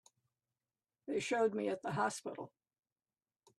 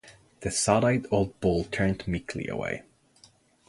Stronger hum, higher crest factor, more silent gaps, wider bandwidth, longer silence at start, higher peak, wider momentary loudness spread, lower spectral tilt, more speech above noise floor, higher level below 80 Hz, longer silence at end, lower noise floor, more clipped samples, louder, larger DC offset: neither; about the same, 20 dB vs 22 dB; neither; first, 13 kHz vs 11.5 kHz; first, 1.05 s vs 0.05 s; second, -22 dBFS vs -6 dBFS; first, 17 LU vs 11 LU; about the same, -4.5 dB/octave vs -5 dB/octave; first, over 53 dB vs 33 dB; second, -82 dBFS vs -48 dBFS; first, 1.1 s vs 0.85 s; first, under -90 dBFS vs -60 dBFS; neither; second, -38 LUFS vs -28 LUFS; neither